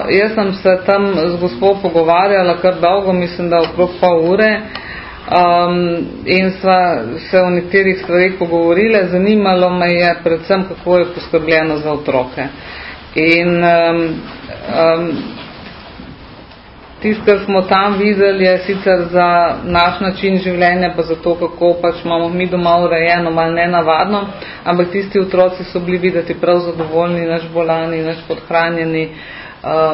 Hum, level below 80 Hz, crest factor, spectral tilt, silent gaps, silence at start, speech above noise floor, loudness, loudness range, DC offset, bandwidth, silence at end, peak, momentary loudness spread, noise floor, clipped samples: none; -42 dBFS; 14 dB; -9 dB/octave; none; 0 s; 24 dB; -13 LUFS; 4 LU; under 0.1%; 5.8 kHz; 0 s; 0 dBFS; 11 LU; -37 dBFS; under 0.1%